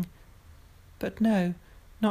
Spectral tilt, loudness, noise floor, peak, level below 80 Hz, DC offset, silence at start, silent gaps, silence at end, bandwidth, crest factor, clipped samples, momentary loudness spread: -7.5 dB/octave; -29 LUFS; -53 dBFS; -16 dBFS; -54 dBFS; under 0.1%; 0 s; none; 0 s; 15 kHz; 16 dB; under 0.1%; 13 LU